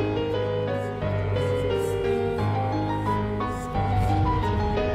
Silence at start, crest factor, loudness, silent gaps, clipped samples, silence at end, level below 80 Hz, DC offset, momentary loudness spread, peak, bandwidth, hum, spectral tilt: 0 s; 12 dB; -26 LUFS; none; under 0.1%; 0 s; -36 dBFS; under 0.1%; 4 LU; -12 dBFS; 14 kHz; none; -7.5 dB/octave